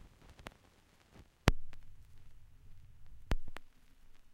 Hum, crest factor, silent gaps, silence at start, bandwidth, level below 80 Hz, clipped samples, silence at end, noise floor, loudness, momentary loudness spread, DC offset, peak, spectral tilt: none; 34 dB; none; 0 s; 16 kHz; -44 dBFS; under 0.1%; 0.05 s; -66 dBFS; -38 LUFS; 28 LU; under 0.1%; -6 dBFS; -5 dB/octave